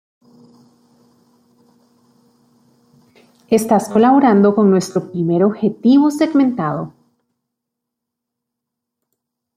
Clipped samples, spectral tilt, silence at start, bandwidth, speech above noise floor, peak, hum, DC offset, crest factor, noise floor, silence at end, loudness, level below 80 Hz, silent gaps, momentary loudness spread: under 0.1%; -7 dB/octave; 3.5 s; 15 kHz; 67 dB; -2 dBFS; none; under 0.1%; 16 dB; -80 dBFS; 2.65 s; -14 LUFS; -62 dBFS; none; 11 LU